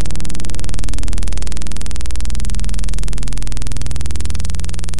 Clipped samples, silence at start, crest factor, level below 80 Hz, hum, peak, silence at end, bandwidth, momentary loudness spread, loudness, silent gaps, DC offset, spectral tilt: under 0.1%; 0 s; 16 dB; -22 dBFS; none; -4 dBFS; 0 s; 11.5 kHz; 2 LU; -25 LUFS; none; 40%; -4.5 dB/octave